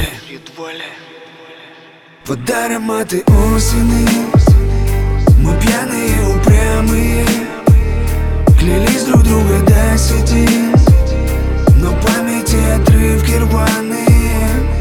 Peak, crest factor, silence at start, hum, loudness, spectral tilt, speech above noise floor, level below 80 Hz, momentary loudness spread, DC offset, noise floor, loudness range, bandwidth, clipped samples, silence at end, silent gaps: 0 dBFS; 10 dB; 0 s; none; -12 LUFS; -6 dB/octave; 29 dB; -14 dBFS; 7 LU; under 0.1%; -40 dBFS; 4 LU; 18 kHz; under 0.1%; 0 s; none